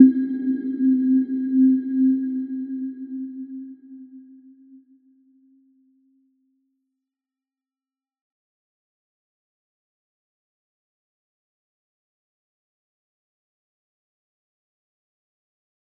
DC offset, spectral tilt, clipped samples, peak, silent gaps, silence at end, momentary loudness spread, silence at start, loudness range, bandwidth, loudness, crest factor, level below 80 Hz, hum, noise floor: under 0.1%; -10 dB/octave; under 0.1%; -2 dBFS; none; 11.8 s; 20 LU; 0 s; 20 LU; 1.7 kHz; -22 LUFS; 26 dB; -82 dBFS; none; under -90 dBFS